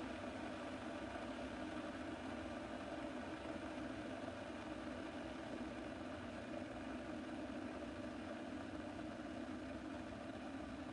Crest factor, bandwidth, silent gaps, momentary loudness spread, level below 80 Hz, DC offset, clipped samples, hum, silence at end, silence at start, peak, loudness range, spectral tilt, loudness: 14 dB; 11 kHz; none; 2 LU; -66 dBFS; under 0.1%; under 0.1%; none; 0 s; 0 s; -34 dBFS; 1 LU; -5.5 dB/octave; -48 LUFS